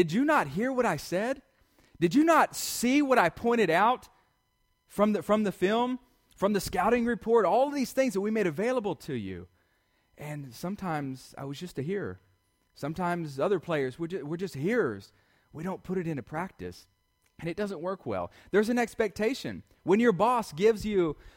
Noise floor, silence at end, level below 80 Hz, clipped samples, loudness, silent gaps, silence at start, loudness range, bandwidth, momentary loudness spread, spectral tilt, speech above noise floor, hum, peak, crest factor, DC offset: -73 dBFS; 0.05 s; -58 dBFS; under 0.1%; -28 LUFS; none; 0 s; 10 LU; 16.5 kHz; 15 LU; -5.5 dB/octave; 45 dB; none; -10 dBFS; 20 dB; under 0.1%